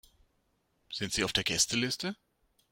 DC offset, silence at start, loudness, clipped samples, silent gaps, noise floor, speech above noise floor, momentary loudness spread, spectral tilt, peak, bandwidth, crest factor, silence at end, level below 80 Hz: under 0.1%; 0.9 s; -30 LUFS; under 0.1%; none; -75 dBFS; 43 dB; 13 LU; -2 dB/octave; -12 dBFS; 16.5 kHz; 22 dB; 0.55 s; -58 dBFS